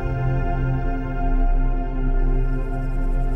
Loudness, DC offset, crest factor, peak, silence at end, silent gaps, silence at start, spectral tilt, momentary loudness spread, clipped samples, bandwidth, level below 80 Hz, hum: -25 LUFS; under 0.1%; 10 dB; -10 dBFS; 0 s; none; 0 s; -10 dB/octave; 3 LU; under 0.1%; 3 kHz; -20 dBFS; none